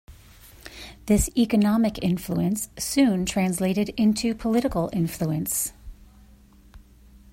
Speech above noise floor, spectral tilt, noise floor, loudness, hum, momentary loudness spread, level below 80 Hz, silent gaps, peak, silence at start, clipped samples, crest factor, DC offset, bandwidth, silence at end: 29 dB; -5 dB/octave; -52 dBFS; -24 LUFS; none; 9 LU; -42 dBFS; none; -8 dBFS; 0.1 s; under 0.1%; 16 dB; under 0.1%; 16.5 kHz; 0.5 s